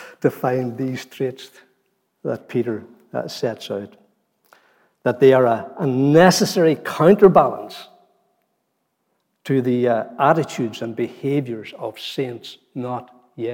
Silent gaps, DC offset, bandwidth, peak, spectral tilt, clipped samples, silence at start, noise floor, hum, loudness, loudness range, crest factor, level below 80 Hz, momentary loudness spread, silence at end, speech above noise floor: none; under 0.1%; 17 kHz; -2 dBFS; -6 dB/octave; under 0.1%; 0 s; -72 dBFS; none; -19 LUFS; 12 LU; 18 dB; -60 dBFS; 19 LU; 0 s; 53 dB